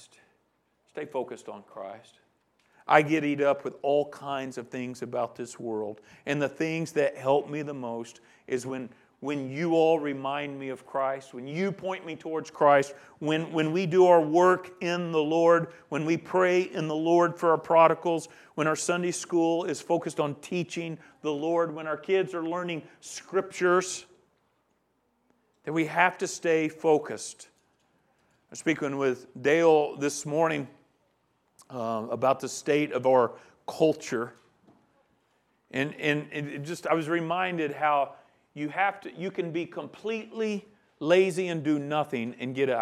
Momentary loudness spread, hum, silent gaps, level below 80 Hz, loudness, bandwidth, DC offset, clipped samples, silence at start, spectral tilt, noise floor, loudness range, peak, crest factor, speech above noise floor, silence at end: 15 LU; none; none; -78 dBFS; -27 LUFS; 13.5 kHz; under 0.1%; under 0.1%; 0.95 s; -5 dB/octave; -73 dBFS; 7 LU; -4 dBFS; 24 dB; 45 dB; 0 s